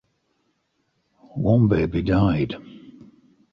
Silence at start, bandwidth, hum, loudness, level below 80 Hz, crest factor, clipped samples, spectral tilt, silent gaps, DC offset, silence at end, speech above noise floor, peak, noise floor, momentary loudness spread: 1.35 s; 5.8 kHz; none; -21 LUFS; -42 dBFS; 16 dB; under 0.1%; -10 dB/octave; none; under 0.1%; 0.6 s; 51 dB; -6 dBFS; -71 dBFS; 15 LU